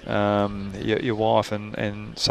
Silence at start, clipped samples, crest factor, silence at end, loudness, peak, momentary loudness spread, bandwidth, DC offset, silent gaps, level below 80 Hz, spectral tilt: 0 s; under 0.1%; 20 dB; 0 s; -24 LUFS; -4 dBFS; 8 LU; 13.5 kHz; under 0.1%; none; -48 dBFS; -5 dB/octave